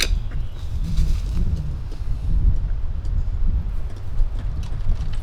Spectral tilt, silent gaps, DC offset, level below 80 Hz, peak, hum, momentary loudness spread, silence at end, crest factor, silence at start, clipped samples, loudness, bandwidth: -5 dB/octave; none; under 0.1%; -22 dBFS; -4 dBFS; none; 8 LU; 0 s; 16 dB; 0 s; under 0.1%; -27 LUFS; 11.5 kHz